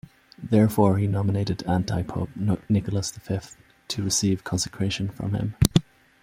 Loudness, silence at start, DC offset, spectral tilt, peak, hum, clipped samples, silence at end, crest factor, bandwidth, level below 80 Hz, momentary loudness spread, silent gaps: -25 LUFS; 0.4 s; under 0.1%; -5.5 dB/octave; -2 dBFS; none; under 0.1%; 0.4 s; 24 dB; 16.5 kHz; -44 dBFS; 9 LU; none